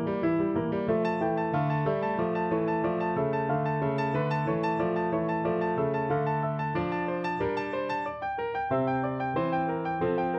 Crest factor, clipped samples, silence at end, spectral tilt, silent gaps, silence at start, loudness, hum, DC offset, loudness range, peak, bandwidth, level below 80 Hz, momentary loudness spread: 12 dB; under 0.1%; 0 s; -9 dB/octave; none; 0 s; -29 LUFS; none; under 0.1%; 2 LU; -16 dBFS; 7.8 kHz; -56 dBFS; 3 LU